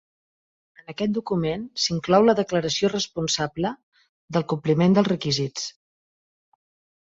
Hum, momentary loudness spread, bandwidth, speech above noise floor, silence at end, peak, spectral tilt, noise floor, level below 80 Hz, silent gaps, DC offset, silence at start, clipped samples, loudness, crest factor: none; 11 LU; 8 kHz; over 67 dB; 1.35 s; -6 dBFS; -5 dB/octave; under -90 dBFS; -58 dBFS; 3.83-3.92 s, 4.09-4.28 s; under 0.1%; 0.9 s; under 0.1%; -23 LUFS; 18 dB